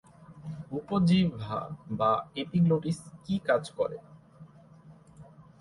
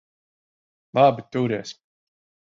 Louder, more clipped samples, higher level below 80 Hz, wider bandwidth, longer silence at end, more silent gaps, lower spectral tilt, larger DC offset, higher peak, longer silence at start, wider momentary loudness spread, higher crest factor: second, -29 LUFS vs -22 LUFS; neither; first, -60 dBFS vs -68 dBFS; first, 11.5 kHz vs 7.4 kHz; second, 0.2 s vs 0.8 s; neither; about the same, -7.5 dB/octave vs -6.5 dB/octave; neither; second, -12 dBFS vs -4 dBFS; second, 0.2 s vs 0.95 s; about the same, 14 LU vs 12 LU; about the same, 18 dB vs 20 dB